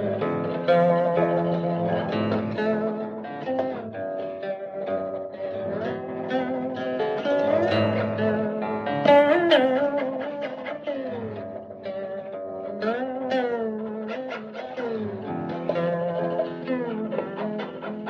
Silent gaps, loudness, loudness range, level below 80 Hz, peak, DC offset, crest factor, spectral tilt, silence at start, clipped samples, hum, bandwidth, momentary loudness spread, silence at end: none; -26 LUFS; 8 LU; -66 dBFS; -4 dBFS; under 0.1%; 20 dB; -8 dB/octave; 0 s; under 0.1%; none; 6.8 kHz; 13 LU; 0 s